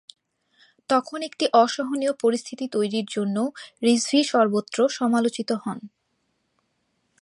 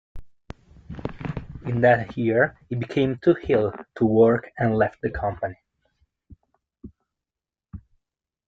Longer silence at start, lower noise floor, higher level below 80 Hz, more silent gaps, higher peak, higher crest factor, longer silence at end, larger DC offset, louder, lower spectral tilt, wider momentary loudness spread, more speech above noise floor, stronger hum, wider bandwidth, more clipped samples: first, 0.9 s vs 0.15 s; second, -73 dBFS vs -90 dBFS; second, -76 dBFS vs -48 dBFS; neither; about the same, -4 dBFS vs -4 dBFS; about the same, 20 dB vs 20 dB; first, 1.35 s vs 0.7 s; neither; about the same, -23 LUFS vs -23 LUFS; second, -4 dB/octave vs -9 dB/octave; second, 9 LU vs 15 LU; second, 50 dB vs 68 dB; neither; first, 11.5 kHz vs 7.2 kHz; neither